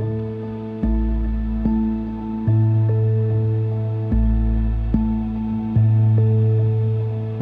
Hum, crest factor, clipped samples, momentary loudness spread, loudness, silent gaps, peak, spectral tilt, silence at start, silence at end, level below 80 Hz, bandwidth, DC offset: none; 12 dB; under 0.1%; 9 LU; -20 LUFS; none; -6 dBFS; -12 dB/octave; 0 s; 0 s; -26 dBFS; 3.6 kHz; under 0.1%